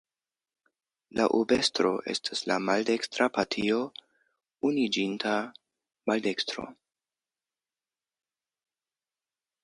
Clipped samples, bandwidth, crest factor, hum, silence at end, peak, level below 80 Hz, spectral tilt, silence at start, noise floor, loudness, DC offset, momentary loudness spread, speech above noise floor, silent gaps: under 0.1%; 11.5 kHz; 20 dB; none; 2.9 s; -10 dBFS; -68 dBFS; -3.5 dB/octave; 1.15 s; under -90 dBFS; -28 LUFS; under 0.1%; 12 LU; over 62 dB; none